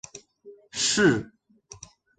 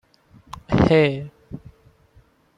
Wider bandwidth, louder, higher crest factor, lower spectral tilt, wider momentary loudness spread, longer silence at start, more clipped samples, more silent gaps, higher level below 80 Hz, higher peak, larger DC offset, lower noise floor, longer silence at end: about the same, 9.6 kHz vs 9.8 kHz; second, -23 LUFS vs -19 LUFS; about the same, 20 dB vs 18 dB; second, -3 dB/octave vs -8 dB/octave; about the same, 26 LU vs 25 LU; second, 0.15 s vs 0.55 s; neither; neither; second, -60 dBFS vs -42 dBFS; second, -8 dBFS vs -4 dBFS; neither; second, -51 dBFS vs -56 dBFS; about the same, 0.95 s vs 1 s